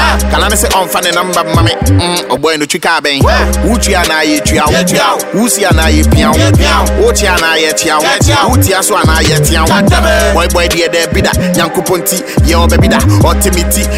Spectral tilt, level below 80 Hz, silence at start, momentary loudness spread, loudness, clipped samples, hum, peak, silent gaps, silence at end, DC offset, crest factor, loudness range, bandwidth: -4 dB/octave; -16 dBFS; 0 s; 3 LU; -9 LUFS; under 0.1%; none; 0 dBFS; none; 0 s; under 0.1%; 8 dB; 2 LU; 16.5 kHz